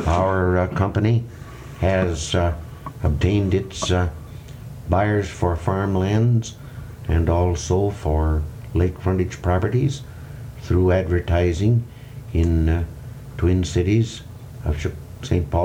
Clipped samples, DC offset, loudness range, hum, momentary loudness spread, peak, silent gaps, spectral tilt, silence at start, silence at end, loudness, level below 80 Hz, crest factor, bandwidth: under 0.1%; under 0.1%; 2 LU; none; 17 LU; -6 dBFS; none; -7 dB/octave; 0 s; 0 s; -21 LUFS; -32 dBFS; 14 dB; 10.5 kHz